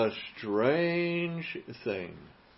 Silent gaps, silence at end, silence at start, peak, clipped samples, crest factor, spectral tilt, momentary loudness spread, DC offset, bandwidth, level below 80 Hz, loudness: none; 0.25 s; 0 s; -14 dBFS; under 0.1%; 16 dB; -10 dB/octave; 12 LU; under 0.1%; 5.8 kHz; -68 dBFS; -31 LUFS